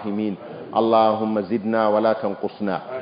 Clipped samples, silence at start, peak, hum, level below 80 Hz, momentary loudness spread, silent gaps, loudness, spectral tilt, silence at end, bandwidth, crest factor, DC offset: under 0.1%; 0 s; -6 dBFS; none; -64 dBFS; 10 LU; none; -21 LUFS; -11 dB/octave; 0 s; 5.2 kHz; 16 dB; under 0.1%